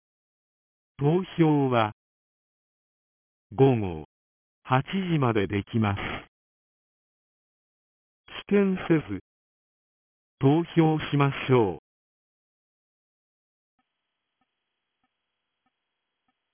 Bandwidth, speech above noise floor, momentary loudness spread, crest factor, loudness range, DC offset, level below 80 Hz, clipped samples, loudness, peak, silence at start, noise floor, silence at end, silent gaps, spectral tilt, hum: 3.6 kHz; 59 dB; 16 LU; 20 dB; 5 LU; under 0.1%; -56 dBFS; under 0.1%; -25 LUFS; -8 dBFS; 1 s; -83 dBFS; 4.75 s; 1.92-3.50 s, 4.05-4.62 s, 6.28-8.24 s, 9.21-10.38 s; -11.5 dB/octave; none